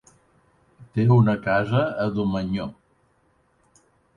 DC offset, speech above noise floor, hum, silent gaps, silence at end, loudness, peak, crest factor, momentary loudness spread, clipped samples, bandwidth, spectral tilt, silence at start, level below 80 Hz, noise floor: under 0.1%; 43 dB; none; none; 1.45 s; -22 LUFS; -6 dBFS; 18 dB; 12 LU; under 0.1%; 7 kHz; -9 dB/octave; 0.8 s; -52 dBFS; -64 dBFS